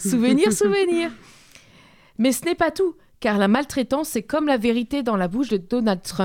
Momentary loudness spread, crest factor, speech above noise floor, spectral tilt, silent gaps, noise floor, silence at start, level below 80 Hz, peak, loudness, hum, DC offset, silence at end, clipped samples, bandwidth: 6 LU; 18 dB; 31 dB; -4.5 dB/octave; none; -51 dBFS; 0 s; -52 dBFS; -4 dBFS; -21 LUFS; none; under 0.1%; 0 s; under 0.1%; 17 kHz